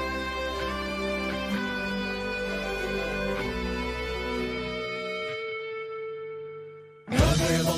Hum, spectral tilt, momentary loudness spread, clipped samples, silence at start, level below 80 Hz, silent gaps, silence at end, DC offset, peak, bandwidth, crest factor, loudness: none; -5 dB/octave; 12 LU; under 0.1%; 0 s; -40 dBFS; none; 0 s; under 0.1%; -10 dBFS; 15.5 kHz; 20 dB; -30 LUFS